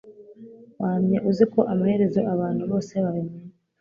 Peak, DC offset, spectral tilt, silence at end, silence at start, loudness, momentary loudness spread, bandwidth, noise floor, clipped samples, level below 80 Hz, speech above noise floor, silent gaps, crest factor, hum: -6 dBFS; under 0.1%; -9 dB/octave; 0.3 s; 0.05 s; -23 LUFS; 10 LU; 7.2 kHz; -46 dBFS; under 0.1%; -62 dBFS; 23 dB; none; 18 dB; none